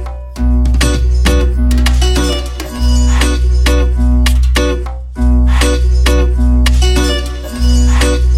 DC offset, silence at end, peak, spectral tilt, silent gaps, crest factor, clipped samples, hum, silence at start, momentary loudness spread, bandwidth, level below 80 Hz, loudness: under 0.1%; 0 s; 0 dBFS; -5 dB/octave; none; 10 dB; under 0.1%; none; 0 s; 6 LU; 13.5 kHz; -10 dBFS; -12 LUFS